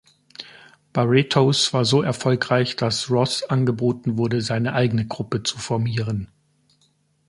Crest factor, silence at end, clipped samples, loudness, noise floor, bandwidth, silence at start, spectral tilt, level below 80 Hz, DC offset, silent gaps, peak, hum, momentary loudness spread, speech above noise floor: 20 dB; 1.05 s; under 0.1%; -21 LUFS; -64 dBFS; 11.5 kHz; 0.4 s; -5.5 dB/octave; -54 dBFS; under 0.1%; none; -2 dBFS; none; 12 LU; 43 dB